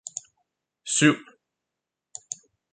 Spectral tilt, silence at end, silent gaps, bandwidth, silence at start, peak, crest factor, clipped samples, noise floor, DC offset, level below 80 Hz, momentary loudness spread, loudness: -3 dB/octave; 0.4 s; none; 9.6 kHz; 0.85 s; -4 dBFS; 26 dB; under 0.1%; -86 dBFS; under 0.1%; -74 dBFS; 22 LU; -22 LUFS